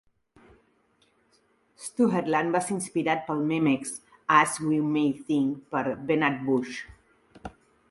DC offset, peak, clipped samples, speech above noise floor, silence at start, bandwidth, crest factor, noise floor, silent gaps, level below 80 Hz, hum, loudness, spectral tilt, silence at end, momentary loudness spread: under 0.1%; -4 dBFS; under 0.1%; 41 dB; 1.8 s; 11.5 kHz; 24 dB; -67 dBFS; none; -64 dBFS; none; -26 LUFS; -5 dB/octave; 0.4 s; 17 LU